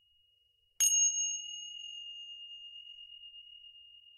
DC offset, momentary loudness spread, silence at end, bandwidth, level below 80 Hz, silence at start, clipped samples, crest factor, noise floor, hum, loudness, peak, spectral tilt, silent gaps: under 0.1%; 24 LU; 0 s; 13.5 kHz; -84 dBFS; 0.8 s; under 0.1%; 22 dB; -73 dBFS; none; -30 LUFS; -16 dBFS; 7 dB/octave; none